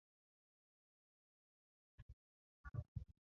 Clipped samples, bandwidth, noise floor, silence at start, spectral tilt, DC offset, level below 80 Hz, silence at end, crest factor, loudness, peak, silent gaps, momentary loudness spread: under 0.1%; 5.6 kHz; under -90 dBFS; 2 s; -9 dB/octave; under 0.1%; -64 dBFS; 0.15 s; 24 dB; -54 LUFS; -36 dBFS; 2.02-2.64 s, 2.88-2.95 s; 16 LU